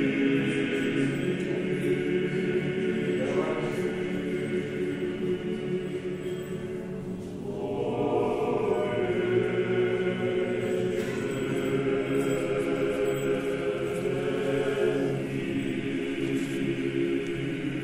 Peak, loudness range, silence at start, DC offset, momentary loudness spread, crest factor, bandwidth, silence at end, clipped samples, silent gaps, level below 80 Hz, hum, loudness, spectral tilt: -14 dBFS; 4 LU; 0 s; under 0.1%; 5 LU; 14 dB; 15.5 kHz; 0 s; under 0.1%; none; -56 dBFS; none; -29 LUFS; -6.5 dB/octave